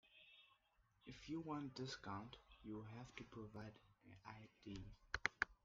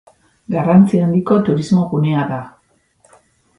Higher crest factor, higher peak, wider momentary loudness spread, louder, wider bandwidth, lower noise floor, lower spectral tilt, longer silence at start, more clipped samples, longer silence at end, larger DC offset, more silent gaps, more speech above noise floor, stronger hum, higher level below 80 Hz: first, 34 dB vs 16 dB; second, -20 dBFS vs 0 dBFS; first, 20 LU vs 12 LU; second, -52 LUFS vs -15 LUFS; second, 7.4 kHz vs 10.5 kHz; first, -80 dBFS vs -58 dBFS; second, -3.5 dB/octave vs -8.5 dB/octave; second, 0.05 s vs 0.5 s; neither; second, 0.1 s vs 1.1 s; neither; neither; second, 26 dB vs 45 dB; neither; second, -70 dBFS vs -54 dBFS